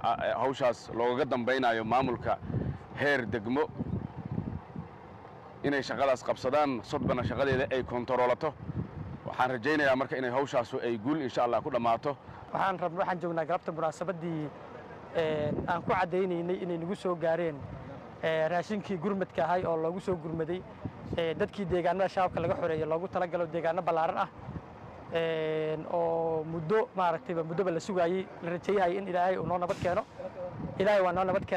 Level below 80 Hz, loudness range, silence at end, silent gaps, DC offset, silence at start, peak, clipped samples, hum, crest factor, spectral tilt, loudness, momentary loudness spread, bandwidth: -58 dBFS; 3 LU; 0 s; none; under 0.1%; 0 s; -16 dBFS; under 0.1%; none; 14 dB; -6.5 dB/octave; -31 LUFS; 10 LU; 11.5 kHz